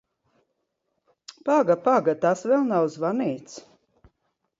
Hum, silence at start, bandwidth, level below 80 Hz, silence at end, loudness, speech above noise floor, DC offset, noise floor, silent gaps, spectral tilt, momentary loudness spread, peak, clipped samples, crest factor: none; 1.45 s; 7.8 kHz; -72 dBFS; 1 s; -23 LUFS; 55 dB; under 0.1%; -77 dBFS; none; -6.5 dB/octave; 15 LU; -8 dBFS; under 0.1%; 18 dB